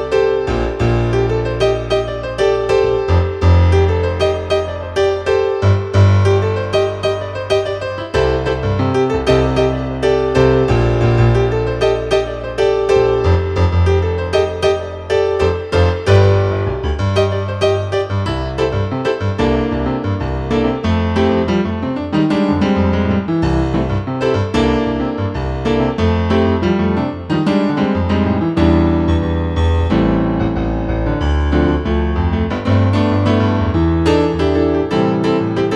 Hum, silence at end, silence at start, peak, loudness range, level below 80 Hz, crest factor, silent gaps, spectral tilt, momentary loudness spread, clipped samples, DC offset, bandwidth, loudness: none; 0 s; 0 s; 0 dBFS; 2 LU; -26 dBFS; 14 dB; none; -7.5 dB/octave; 6 LU; under 0.1%; under 0.1%; 9.8 kHz; -16 LUFS